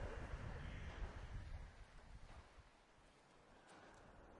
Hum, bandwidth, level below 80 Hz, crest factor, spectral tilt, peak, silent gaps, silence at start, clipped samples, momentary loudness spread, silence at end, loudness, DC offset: none; 10.5 kHz; -56 dBFS; 16 dB; -6 dB/octave; -38 dBFS; none; 0 s; under 0.1%; 17 LU; 0 s; -56 LUFS; under 0.1%